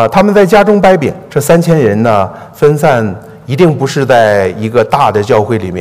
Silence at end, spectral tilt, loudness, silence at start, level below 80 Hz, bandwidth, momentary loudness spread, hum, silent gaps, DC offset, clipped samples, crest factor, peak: 0 s; -6.5 dB/octave; -9 LUFS; 0 s; -42 dBFS; 16 kHz; 8 LU; none; none; under 0.1%; 2%; 8 dB; 0 dBFS